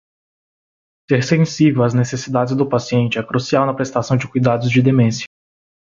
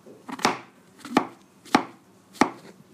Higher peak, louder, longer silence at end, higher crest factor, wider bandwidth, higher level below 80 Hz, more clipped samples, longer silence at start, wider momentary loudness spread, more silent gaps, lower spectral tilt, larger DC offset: about the same, -2 dBFS vs -2 dBFS; first, -17 LUFS vs -26 LUFS; first, 0.65 s vs 0.2 s; second, 14 dB vs 28 dB; second, 7.6 kHz vs 15.5 kHz; first, -54 dBFS vs -66 dBFS; neither; first, 1.1 s vs 0.05 s; second, 6 LU vs 16 LU; neither; first, -6.5 dB/octave vs -3.5 dB/octave; neither